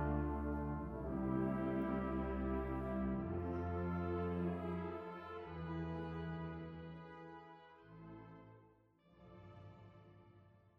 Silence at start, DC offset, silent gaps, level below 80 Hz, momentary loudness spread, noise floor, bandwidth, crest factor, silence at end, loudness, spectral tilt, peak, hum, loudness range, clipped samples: 0 s; under 0.1%; none; -52 dBFS; 20 LU; -70 dBFS; 5.6 kHz; 16 dB; 0.2 s; -42 LUFS; -10 dB/octave; -26 dBFS; none; 17 LU; under 0.1%